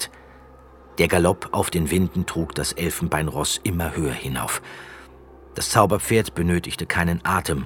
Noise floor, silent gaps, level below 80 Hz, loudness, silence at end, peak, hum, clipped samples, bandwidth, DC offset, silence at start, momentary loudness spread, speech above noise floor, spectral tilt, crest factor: -47 dBFS; none; -40 dBFS; -22 LUFS; 0 s; 0 dBFS; none; under 0.1%; 19 kHz; under 0.1%; 0 s; 10 LU; 24 dB; -4.5 dB/octave; 22 dB